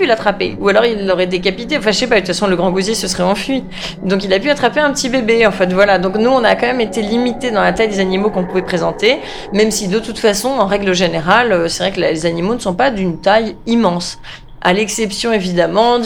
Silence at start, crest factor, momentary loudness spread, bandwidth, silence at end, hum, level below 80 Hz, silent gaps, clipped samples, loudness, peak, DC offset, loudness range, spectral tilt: 0 s; 14 dB; 6 LU; 18 kHz; 0 s; none; -38 dBFS; none; under 0.1%; -14 LUFS; 0 dBFS; under 0.1%; 2 LU; -4.5 dB/octave